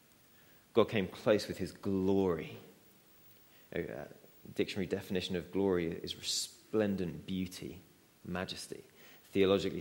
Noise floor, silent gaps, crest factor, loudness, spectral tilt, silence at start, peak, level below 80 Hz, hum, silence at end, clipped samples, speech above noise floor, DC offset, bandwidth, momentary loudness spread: -63 dBFS; none; 24 dB; -35 LUFS; -5 dB/octave; 0.75 s; -12 dBFS; -66 dBFS; none; 0 s; under 0.1%; 29 dB; under 0.1%; 16.5 kHz; 17 LU